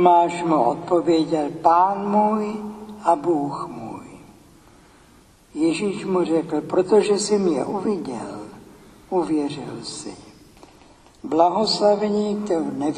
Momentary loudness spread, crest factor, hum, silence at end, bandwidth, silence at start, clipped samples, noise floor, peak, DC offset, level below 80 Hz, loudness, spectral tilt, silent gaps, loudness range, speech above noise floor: 16 LU; 20 dB; none; 0 s; 11.5 kHz; 0 s; under 0.1%; -52 dBFS; -2 dBFS; under 0.1%; -58 dBFS; -21 LUFS; -5.5 dB/octave; none; 7 LU; 32 dB